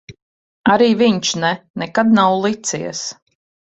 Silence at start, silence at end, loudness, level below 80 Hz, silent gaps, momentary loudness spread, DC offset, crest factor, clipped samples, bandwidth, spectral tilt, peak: 0.1 s; 0.65 s; -16 LUFS; -58 dBFS; 0.22-0.64 s, 1.70-1.74 s; 12 LU; under 0.1%; 16 dB; under 0.1%; 8.2 kHz; -4 dB/octave; -2 dBFS